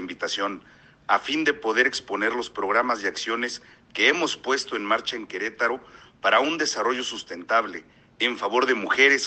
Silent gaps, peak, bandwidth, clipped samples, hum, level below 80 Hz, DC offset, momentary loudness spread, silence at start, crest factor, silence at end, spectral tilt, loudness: none; -4 dBFS; 8.8 kHz; under 0.1%; none; -66 dBFS; under 0.1%; 10 LU; 0 s; 20 dB; 0 s; -1.5 dB/octave; -24 LUFS